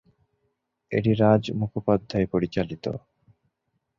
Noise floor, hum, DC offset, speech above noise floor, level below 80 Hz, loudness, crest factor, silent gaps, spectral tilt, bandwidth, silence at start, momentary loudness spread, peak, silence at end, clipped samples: -77 dBFS; none; under 0.1%; 53 dB; -52 dBFS; -25 LUFS; 20 dB; none; -8.5 dB/octave; 7.2 kHz; 0.9 s; 12 LU; -6 dBFS; 1 s; under 0.1%